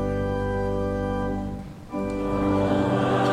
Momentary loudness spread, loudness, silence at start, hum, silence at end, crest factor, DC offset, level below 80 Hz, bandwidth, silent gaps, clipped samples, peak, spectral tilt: 9 LU; -26 LUFS; 0 s; none; 0 s; 14 dB; under 0.1%; -38 dBFS; 12.5 kHz; none; under 0.1%; -10 dBFS; -7.5 dB/octave